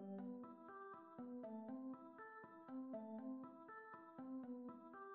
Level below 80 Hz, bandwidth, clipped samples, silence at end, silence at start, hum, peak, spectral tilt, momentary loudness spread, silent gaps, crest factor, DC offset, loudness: under -90 dBFS; 4 kHz; under 0.1%; 0 s; 0 s; none; -42 dBFS; -7.5 dB/octave; 6 LU; none; 12 dB; under 0.1%; -55 LUFS